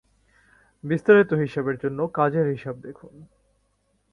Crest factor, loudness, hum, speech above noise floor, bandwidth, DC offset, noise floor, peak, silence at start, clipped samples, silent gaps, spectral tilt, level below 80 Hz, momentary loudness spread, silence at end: 20 dB; -22 LUFS; none; 46 dB; 6.4 kHz; under 0.1%; -69 dBFS; -4 dBFS; 0.85 s; under 0.1%; none; -9 dB/octave; -62 dBFS; 20 LU; 0.9 s